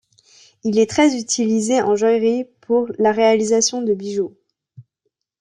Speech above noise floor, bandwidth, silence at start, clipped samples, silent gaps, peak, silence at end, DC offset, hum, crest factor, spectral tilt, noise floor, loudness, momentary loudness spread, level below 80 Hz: 58 dB; 10.5 kHz; 0.65 s; under 0.1%; none; -4 dBFS; 0.6 s; under 0.1%; none; 14 dB; -3.5 dB/octave; -74 dBFS; -18 LUFS; 9 LU; -64 dBFS